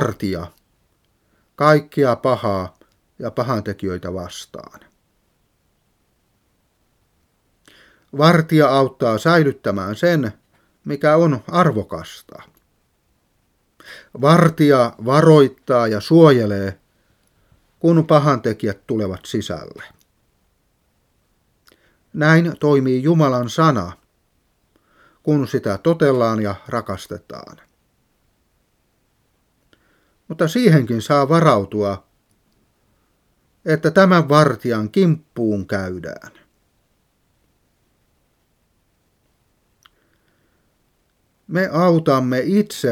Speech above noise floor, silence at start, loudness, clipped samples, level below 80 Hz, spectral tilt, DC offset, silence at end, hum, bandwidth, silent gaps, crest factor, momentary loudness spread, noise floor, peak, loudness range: 48 dB; 0 s; -17 LUFS; under 0.1%; -58 dBFS; -7 dB/octave; under 0.1%; 0 s; none; 15 kHz; none; 20 dB; 18 LU; -65 dBFS; 0 dBFS; 13 LU